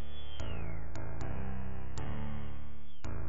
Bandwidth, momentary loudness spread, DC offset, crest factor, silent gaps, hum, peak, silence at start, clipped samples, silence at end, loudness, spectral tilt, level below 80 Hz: 7.2 kHz; 6 LU; 4%; 14 dB; none; none; -22 dBFS; 0 s; under 0.1%; 0 s; -43 LUFS; -6 dB/octave; -46 dBFS